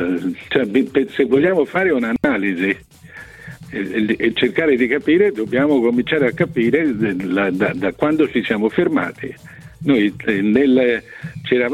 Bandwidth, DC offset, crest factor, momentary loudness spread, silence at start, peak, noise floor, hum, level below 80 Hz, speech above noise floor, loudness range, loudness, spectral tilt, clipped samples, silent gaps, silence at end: 12.5 kHz; under 0.1%; 16 dB; 12 LU; 0 s; -2 dBFS; -37 dBFS; none; -50 dBFS; 20 dB; 3 LU; -17 LUFS; -7 dB/octave; under 0.1%; none; 0 s